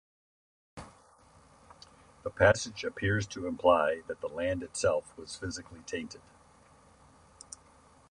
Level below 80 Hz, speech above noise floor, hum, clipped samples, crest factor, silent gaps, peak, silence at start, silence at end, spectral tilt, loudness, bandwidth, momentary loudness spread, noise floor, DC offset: -54 dBFS; 30 dB; none; under 0.1%; 24 dB; none; -8 dBFS; 0.75 s; 1.9 s; -4.5 dB/octave; -31 LUFS; 11 kHz; 24 LU; -60 dBFS; under 0.1%